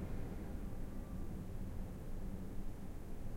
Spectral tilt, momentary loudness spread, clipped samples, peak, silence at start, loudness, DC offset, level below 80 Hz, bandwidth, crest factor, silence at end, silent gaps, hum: -7.5 dB/octave; 3 LU; under 0.1%; -32 dBFS; 0 s; -49 LUFS; under 0.1%; -46 dBFS; 16.5 kHz; 12 dB; 0 s; none; none